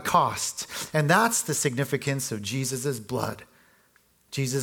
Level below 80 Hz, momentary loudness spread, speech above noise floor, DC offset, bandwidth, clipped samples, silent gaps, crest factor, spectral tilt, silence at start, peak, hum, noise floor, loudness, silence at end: -64 dBFS; 11 LU; 37 dB; under 0.1%; 19 kHz; under 0.1%; none; 22 dB; -4 dB/octave; 0 s; -6 dBFS; none; -63 dBFS; -26 LUFS; 0 s